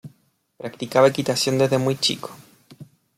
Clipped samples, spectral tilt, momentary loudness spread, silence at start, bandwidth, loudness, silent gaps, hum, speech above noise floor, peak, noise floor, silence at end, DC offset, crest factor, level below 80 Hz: under 0.1%; -4.5 dB/octave; 19 LU; 0.05 s; 16 kHz; -20 LUFS; none; none; 41 dB; -4 dBFS; -62 dBFS; 0.35 s; under 0.1%; 20 dB; -64 dBFS